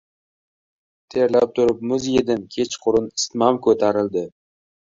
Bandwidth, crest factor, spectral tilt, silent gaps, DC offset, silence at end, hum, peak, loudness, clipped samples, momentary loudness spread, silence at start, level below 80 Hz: 7.8 kHz; 20 dB; -4.5 dB/octave; none; under 0.1%; 0.6 s; none; -2 dBFS; -20 LUFS; under 0.1%; 8 LU; 1.15 s; -54 dBFS